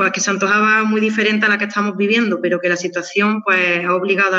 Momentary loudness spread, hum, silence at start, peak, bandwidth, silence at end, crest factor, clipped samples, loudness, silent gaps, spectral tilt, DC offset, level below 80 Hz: 5 LU; none; 0 s; -2 dBFS; 8 kHz; 0 s; 14 dB; under 0.1%; -16 LUFS; none; -4 dB/octave; under 0.1%; -76 dBFS